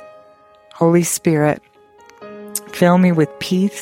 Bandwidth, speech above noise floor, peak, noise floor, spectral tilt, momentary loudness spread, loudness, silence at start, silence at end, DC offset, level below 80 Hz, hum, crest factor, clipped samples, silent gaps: 16.5 kHz; 33 dB; -2 dBFS; -48 dBFS; -6 dB/octave; 14 LU; -16 LUFS; 0 s; 0 s; under 0.1%; -60 dBFS; none; 16 dB; under 0.1%; none